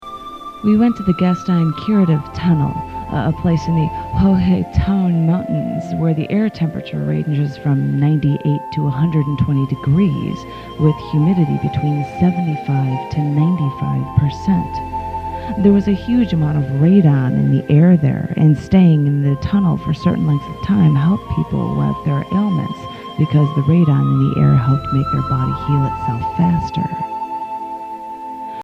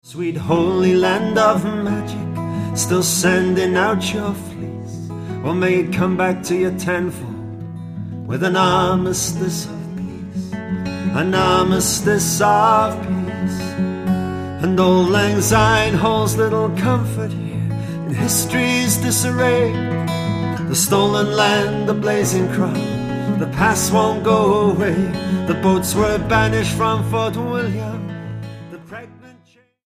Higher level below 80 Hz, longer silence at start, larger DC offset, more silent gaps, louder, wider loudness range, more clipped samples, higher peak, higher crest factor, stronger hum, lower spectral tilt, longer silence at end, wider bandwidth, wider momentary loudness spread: about the same, -36 dBFS vs -40 dBFS; about the same, 0 s vs 0.05 s; neither; neither; about the same, -16 LUFS vs -18 LUFS; about the same, 4 LU vs 4 LU; neither; about the same, 0 dBFS vs 0 dBFS; about the same, 16 dB vs 18 dB; neither; first, -9.5 dB/octave vs -5 dB/octave; second, 0 s vs 0.55 s; second, 6.6 kHz vs 15.5 kHz; about the same, 11 LU vs 13 LU